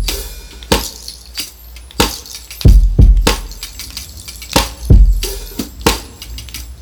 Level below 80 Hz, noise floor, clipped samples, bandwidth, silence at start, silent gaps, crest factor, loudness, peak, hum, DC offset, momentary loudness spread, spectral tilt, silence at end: -16 dBFS; -34 dBFS; under 0.1%; over 20 kHz; 0 s; none; 14 dB; -15 LUFS; 0 dBFS; none; under 0.1%; 18 LU; -4.5 dB/octave; 0 s